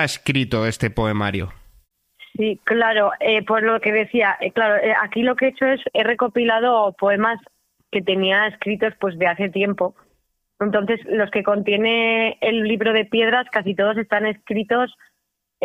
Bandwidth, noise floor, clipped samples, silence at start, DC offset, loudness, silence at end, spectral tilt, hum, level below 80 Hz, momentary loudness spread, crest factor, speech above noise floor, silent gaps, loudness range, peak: 14 kHz; -75 dBFS; under 0.1%; 0 s; under 0.1%; -19 LUFS; 0 s; -5.5 dB/octave; none; -50 dBFS; 6 LU; 16 dB; 56 dB; none; 3 LU; -4 dBFS